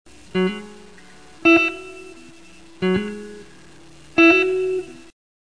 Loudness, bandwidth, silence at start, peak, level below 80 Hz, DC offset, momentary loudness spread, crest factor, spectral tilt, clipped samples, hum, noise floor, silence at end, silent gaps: -18 LUFS; 10.5 kHz; 0.35 s; -2 dBFS; -54 dBFS; 0.5%; 24 LU; 20 dB; -5.5 dB/octave; under 0.1%; none; -47 dBFS; 0.6 s; none